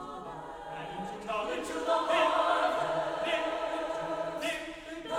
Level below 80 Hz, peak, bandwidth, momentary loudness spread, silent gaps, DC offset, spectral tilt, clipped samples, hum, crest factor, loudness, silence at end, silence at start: -60 dBFS; -16 dBFS; 15.5 kHz; 15 LU; none; under 0.1%; -3.5 dB/octave; under 0.1%; none; 18 dB; -32 LUFS; 0 s; 0 s